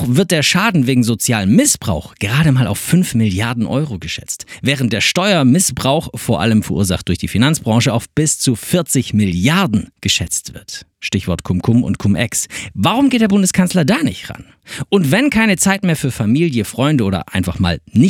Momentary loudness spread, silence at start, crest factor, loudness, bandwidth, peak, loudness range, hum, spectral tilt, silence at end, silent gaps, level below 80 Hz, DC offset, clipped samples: 8 LU; 0 s; 14 dB; -15 LUFS; 18 kHz; 0 dBFS; 2 LU; none; -4.5 dB/octave; 0 s; none; -40 dBFS; under 0.1%; under 0.1%